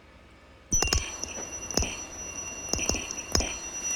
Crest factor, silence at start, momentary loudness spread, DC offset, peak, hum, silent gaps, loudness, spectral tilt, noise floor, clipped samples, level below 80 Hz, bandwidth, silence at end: 26 dB; 0 s; 9 LU; under 0.1%; -6 dBFS; none; none; -29 LUFS; -2 dB/octave; -53 dBFS; under 0.1%; -38 dBFS; 19 kHz; 0 s